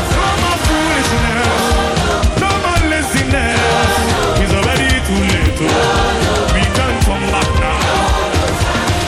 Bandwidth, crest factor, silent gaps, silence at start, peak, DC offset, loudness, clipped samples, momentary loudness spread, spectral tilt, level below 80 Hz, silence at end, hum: 16 kHz; 12 dB; none; 0 s; -2 dBFS; under 0.1%; -14 LUFS; under 0.1%; 2 LU; -4.5 dB/octave; -22 dBFS; 0 s; none